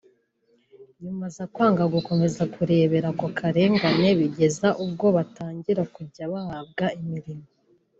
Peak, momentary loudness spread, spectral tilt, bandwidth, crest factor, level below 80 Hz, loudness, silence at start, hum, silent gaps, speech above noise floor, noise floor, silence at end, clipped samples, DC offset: -8 dBFS; 14 LU; -6.5 dB/octave; 8 kHz; 16 dB; -60 dBFS; -24 LUFS; 0.8 s; none; none; 43 dB; -66 dBFS; 0.55 s; under 0.1%; under 0.1%